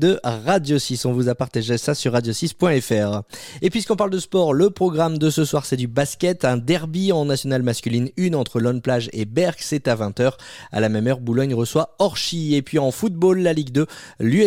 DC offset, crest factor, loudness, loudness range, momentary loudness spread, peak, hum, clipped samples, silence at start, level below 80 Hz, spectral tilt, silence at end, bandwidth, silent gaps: under 0.1%; 14 dB; -21 LUFS; 2 LU; 5 LU; -6 dBFS; none; under 0.1%; 0 s; -54 dBFS; -5.5 dB/octave; 0 s; 16.5 kHz; none